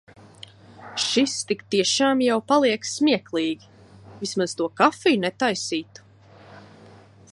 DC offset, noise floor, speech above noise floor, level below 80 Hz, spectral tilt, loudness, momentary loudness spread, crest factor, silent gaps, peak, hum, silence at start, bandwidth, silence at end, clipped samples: under 0.1%; -49 dBFS; 27 dB; -66 dBFS; -3 dB/octave; -22 LUFS; 9 LU; 22 dB; none; -4 dBFS; none; 0.8 s; 11.5 kHz; 0.75 s; under 0.1%